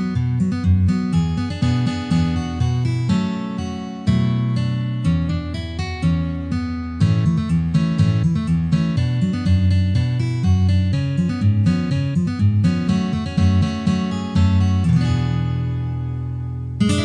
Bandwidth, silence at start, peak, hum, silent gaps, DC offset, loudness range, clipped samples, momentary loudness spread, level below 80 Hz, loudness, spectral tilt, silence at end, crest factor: 10 kHz; 0 s; -6 dBFS; none; none; under 0.1%; 3 LU; under 0.1%; 7 LU; -34 dBFS; -20 LUFS; -7.5 dB/octave; 0 s; 12 dB